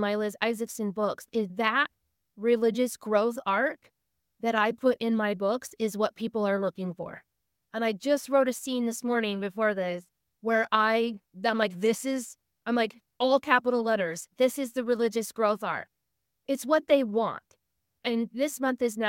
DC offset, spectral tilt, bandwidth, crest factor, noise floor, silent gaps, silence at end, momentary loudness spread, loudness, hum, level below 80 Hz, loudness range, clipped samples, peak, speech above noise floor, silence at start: under 0.1%; -4.5 dB/octave; 17 kHz; 22 dB; -82 dBFS; none; 0 s; 9 LU; -28 LUFS; none; -78 dBFS; 2 LU; under 0.1%; -6 dBFS; 55 dB; 0 s